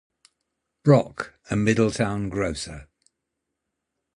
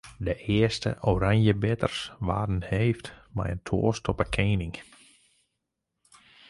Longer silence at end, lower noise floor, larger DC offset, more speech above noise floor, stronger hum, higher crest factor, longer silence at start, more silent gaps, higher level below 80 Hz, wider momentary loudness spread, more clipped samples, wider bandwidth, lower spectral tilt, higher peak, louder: second, 1.35 s vs 1.65 s; about the same, -82 dBFS vs -83 dBFS; neither; about the same, 59 dB vs 56 dB; neither; about the same, 22 dB vs 18 dB; first, 0.85 s vs 0.05 s; neither; second, -50 dBFS vs -42 dBFS; first, 16 LU vs 10 LU; neither; about the same, 11.5 kHz vs 11.5 kHz; about the same, -6.5 dB/octave vs -6.5 dB/octave; first, -4 dBFS vs -8 dBFS; first, -23 LUFS vs -27 LUFS